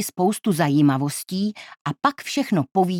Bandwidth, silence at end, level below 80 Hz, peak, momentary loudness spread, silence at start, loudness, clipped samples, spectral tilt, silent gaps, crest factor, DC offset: 18 kHz; 0 s; -70 dBFS; -4 dBFS; 9 LU; 0 s; -22 LUFS; under 0.1%; -5.5 dB/octave; 1.81-1.85 s; 18 dB; under 0.1%